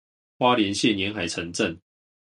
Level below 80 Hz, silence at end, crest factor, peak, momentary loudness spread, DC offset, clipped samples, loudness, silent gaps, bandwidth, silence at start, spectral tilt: -54 dBFS; 0.6 s; 20 dB; -6 dBFS; 8 LU; under 0.1%; under 0.1%; -24 LUFS; none; 11.5 kHz; 0.4 s; -4 dB/octave